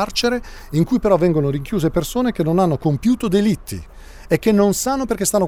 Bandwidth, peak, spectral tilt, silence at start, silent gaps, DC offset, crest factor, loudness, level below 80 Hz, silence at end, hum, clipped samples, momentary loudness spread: 20 kHz; -2 dBFS; -5.5 dB/octave; 0 s; none; under 0.1%; 16 dB; -18 LUFS; -38 dBFS; 0 s; none; under 0.1%; 7 LU